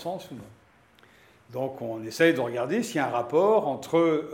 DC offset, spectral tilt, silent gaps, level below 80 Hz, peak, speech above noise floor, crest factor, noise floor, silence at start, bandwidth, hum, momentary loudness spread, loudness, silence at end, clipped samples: under 0.1%; -5.5 dB/octave; none; -72 dBFS; -8 dBFS; 32 dB; 20 dB; -58 dBFS; 0 s; 16.5 kHz; none; 15 LU; -26 LUFS; 0 s; under 0.1%